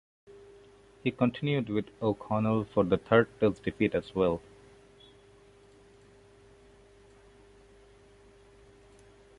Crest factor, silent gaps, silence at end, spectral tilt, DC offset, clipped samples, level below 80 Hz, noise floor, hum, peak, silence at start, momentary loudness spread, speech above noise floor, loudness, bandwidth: 24 dB; none; 5 s; -8 dB/octave; under 0.1%; under 0.1%; -58 dBFS; -58 dBFS; none; -8 dBFS; 0.3 s; 8 LU; 29 dB; -29 LUFS; 11 kHz